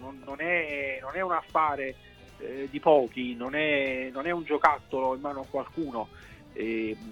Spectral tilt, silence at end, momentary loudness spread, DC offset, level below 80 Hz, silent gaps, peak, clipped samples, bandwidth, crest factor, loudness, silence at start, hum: -6 dB/octave; 0 s; 13 LU; under 0.1%; -58 dBFS; none; -6 dBFS; under 0.1%; 16 kHz; 24 dB; -29 LUFS; 0 s; none